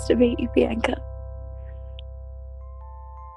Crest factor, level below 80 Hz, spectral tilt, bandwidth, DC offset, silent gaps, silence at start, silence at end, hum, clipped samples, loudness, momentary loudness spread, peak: 22 dB; -36 dBFS; -6.5 dB/octave; 11 kHz; under 0.1%; none; 0 s; 0 s; none; under 0.1%; -23 LUFS; 21 LU; -4 dBFS